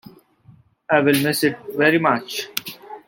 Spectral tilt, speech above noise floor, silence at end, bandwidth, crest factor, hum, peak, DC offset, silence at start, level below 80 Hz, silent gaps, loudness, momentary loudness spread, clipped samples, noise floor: -4.5 dB/octave; 33 dB; 0.1 s; 17 kHz; 22 dB; none; 0 dBFS; under 0.1%; 0.9 s; -64 dBFS; none; -19 LUFS; 12 LU; under 0.1%; -52 dBFS